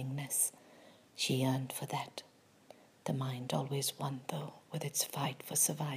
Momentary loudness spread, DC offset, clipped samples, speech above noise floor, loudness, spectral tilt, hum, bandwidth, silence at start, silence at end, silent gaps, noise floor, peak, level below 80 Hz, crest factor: 13 LU; under 0.1%; under 0.1%; 25 dB; -36 LUFS; -3.5 dB/octave; none; 15.5 kHz; 0 s; 0 s; none; -61 dBFS; -16 dBFS; -84 dBFS; 20 dB